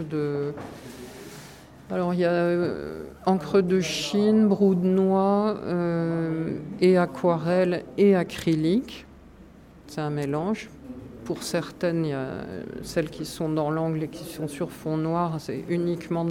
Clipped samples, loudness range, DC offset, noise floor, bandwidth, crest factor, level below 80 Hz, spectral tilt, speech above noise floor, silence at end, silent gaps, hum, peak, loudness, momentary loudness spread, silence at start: under 0.1%; 7 LU; under 0.1%; -49 dBFS; 16 kHz; 16 dB; -56 dBFS; -6.5 dB/octave; 24 dB; 0 s; none; none; -10 dBFS; -25 LUFS; 18 LU; 0 s